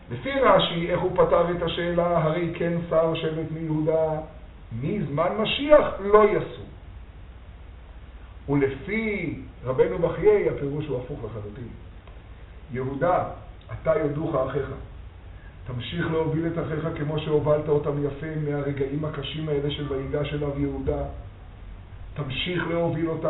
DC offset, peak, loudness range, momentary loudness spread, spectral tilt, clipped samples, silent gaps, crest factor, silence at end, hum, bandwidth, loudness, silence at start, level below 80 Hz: under 0.1%; -2 dBFS; 7 LU; 24 LU; -5 dB/octave; under 0.1%; none; 24 dB; 0 s; none; 4.1 kHz; -25 LUFS; 0 s; -44 dBFS